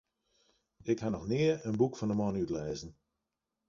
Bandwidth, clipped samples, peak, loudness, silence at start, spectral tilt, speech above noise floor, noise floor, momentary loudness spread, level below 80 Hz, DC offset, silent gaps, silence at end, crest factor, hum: 7.4 kHz; under 0.1%; -16 dBFS; -33 LUFS; 0.85 s; -7 dB/octave; 55 dB; -87 dBFS; 12 LU; -60 dBFS; under 0.1%; none; 0.75 s; 20 dB; none